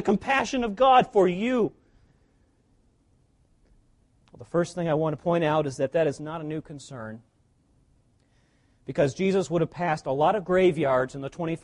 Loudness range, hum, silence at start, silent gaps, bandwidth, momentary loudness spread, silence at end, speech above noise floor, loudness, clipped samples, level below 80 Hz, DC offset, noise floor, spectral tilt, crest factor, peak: 9 LU; none; 0 s; none; 11 kHz; 15 LU; 0.05 s; 40 dB; -25 LUFS; under 0.1%; -58 dBFS; under 0.1%; -65 dBFS; -6 dB/octave; 18 dB; -8 dBFS